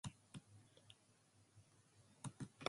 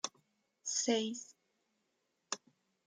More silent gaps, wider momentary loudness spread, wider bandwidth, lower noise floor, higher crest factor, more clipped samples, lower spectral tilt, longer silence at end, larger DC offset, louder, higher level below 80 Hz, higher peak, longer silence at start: neither; about the same, 14 LU vs 14 LU; first, 11.5 kHz vs 10 kHz; second, -74 dBFS vs -82 dBFS; first, 34 dB vs 22 dB; neither; first, -4.5 dB/octave vs -1.5 dB/octave; second, 0 s vs 0.5 s; neither; second, -59 LUFS vs -38 LUFS; first, -78 dBFS vs under -90 dBFS; about the same, -22 dBFS vs -20 dBFS; about the same, 0.05 s vs 0.05 s